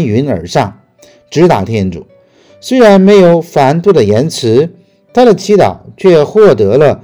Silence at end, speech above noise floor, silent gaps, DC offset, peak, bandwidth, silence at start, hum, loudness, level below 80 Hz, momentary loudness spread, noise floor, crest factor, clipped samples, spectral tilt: 0.05 s; 36 dB; none; under 0.1%; 0 dBFS; 14 kHz; 0 s; none; -8 LUFS; -46 dBFS; 11 LU; -43 dBFS; 8 dB; 5%; -6.5 dB/octave